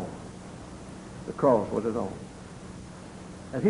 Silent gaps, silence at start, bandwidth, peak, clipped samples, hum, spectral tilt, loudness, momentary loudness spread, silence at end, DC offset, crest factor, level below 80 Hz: none; 0 s; 11 kHz; -10 dBFS; under 0.1%; none; -7 dB/octave; -28 LUFS; 20 LU; 0 s; under 0.1%; 20 dB; -54 dBFS